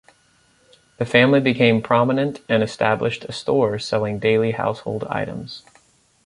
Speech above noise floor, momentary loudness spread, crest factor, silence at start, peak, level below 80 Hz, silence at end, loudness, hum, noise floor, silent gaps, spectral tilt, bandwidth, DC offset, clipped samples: 39 dB; 12 LU; 18 dB; 1 s; -2 dBFS; -56 dBFS; 0.65 s; -20 LUFS; none; -59 dBFS; none; -6.5 dB/octave; 11.5 kHz; under 0.1%; under 0.1%